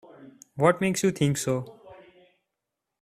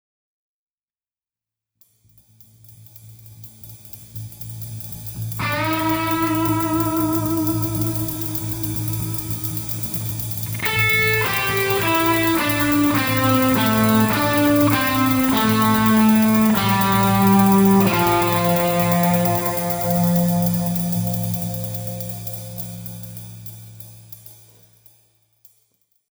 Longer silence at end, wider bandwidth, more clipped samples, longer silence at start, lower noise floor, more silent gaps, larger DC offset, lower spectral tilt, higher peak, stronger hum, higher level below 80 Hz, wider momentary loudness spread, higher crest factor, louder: second, 1.05 s vs 1.8 s; second, 15 kHz vs over 20 kHz; neither; second, 0.2 s vs 2.7 s; second, -85 dBFS vs under -90 dBFS; neither; neither; about the same, -5.5 dB/octave vs -5 dB/octave; second, -6 dBFS vs -2 dBFS; neither; second, -62 dBFS vs -46 dBFS; about the same, 16 LU vs 18 LU; about the same, 22 dB vs 18 dB; second, -25 LUFS vs -18 LUFS